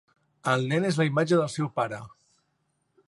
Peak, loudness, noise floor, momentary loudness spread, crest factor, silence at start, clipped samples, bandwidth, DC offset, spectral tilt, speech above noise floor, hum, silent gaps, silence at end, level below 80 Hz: -10 dBFS; -26 LUFS; -74 dBFS; 9 LU; 18 dB; 0.45 s; under 0.1%; 11.5 kHz; under 0.1%; -6 dB/octave; 49 dB; none; none; 1 s; -70 dBFS